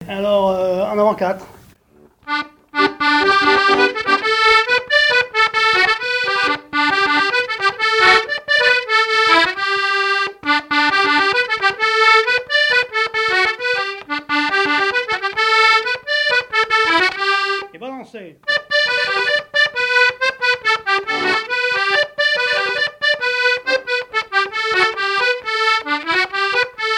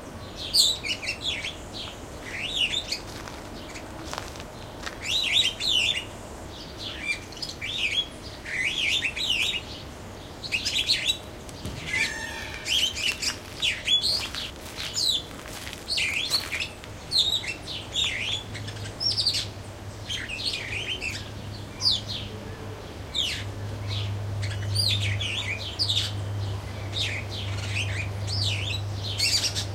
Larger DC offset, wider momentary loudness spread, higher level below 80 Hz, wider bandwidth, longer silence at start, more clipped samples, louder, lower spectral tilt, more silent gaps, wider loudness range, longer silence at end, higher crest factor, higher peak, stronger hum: neither; second, 6 LU vs 16 LU; second, -56 dBFS vs -46 dBFS; about the same, 16.5 kHz vs 16.5 kHz; about the same, 0 s vs 0 s; neither; first, -15 LUFS vs -26 LUFS; about the same, -2 dB/octave vs -2 dB/octave; neither; about the same, 3 LU vs 4 LU; about the same, 0 s vs 0 s; second, 16 dB vs 22 dB; first, 0 dBFS vs -6 dBFS; neither